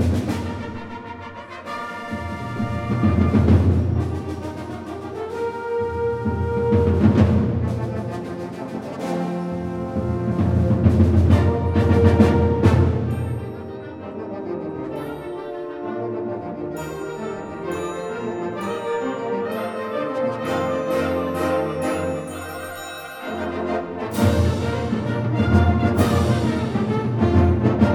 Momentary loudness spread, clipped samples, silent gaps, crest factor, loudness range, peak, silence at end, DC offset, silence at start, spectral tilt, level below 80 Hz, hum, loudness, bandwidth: 14 LU; under 0.1%; none; 18 dB; 10 LU; -2 dBFS; 0 s; under 0.1%; 0 s; -8 dB/octave; -34 dBFS; none; -22 LUFS; 16.5 kHz